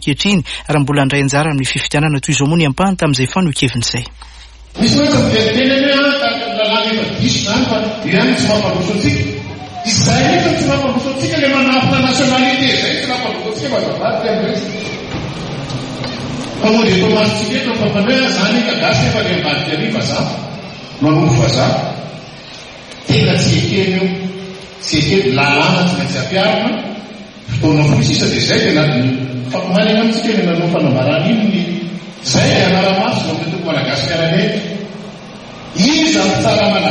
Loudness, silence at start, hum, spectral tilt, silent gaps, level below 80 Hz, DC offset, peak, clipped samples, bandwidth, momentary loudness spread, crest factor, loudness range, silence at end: -14 LUFS; 0 s; none; -5 dB/octave; none; -40 dBFS; under 0.1%; 0 dBFS; under 0.1%; 11 kHz; 12 LU; 14 dB; 3 LU; 0 s